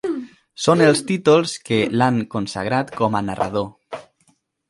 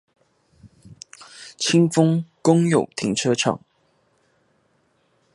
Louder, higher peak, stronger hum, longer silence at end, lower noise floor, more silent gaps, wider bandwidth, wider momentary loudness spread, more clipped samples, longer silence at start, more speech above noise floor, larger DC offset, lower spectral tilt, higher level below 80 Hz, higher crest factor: about the same, -19 LUFS vs -20 LUFS; about the same, 0 dBFS vs -2 dBFS; neither; second, 0.7 s vs 1.75 s; about the same, -63 dBFS vs -65 dBFS; neither; about the same, 11.5 kHz vs 11.5 kHz; second, 16 LU vs 23 LU; neither; second, 0.05 s vs 0.85 s; about the same, 44 dB vs 46 dB; neither; about the same, -5.5 dB/octave vs -5 dB/octave; first, -54 dBFS vs -64 dBFS; about the same, 20 dB vs 20 dB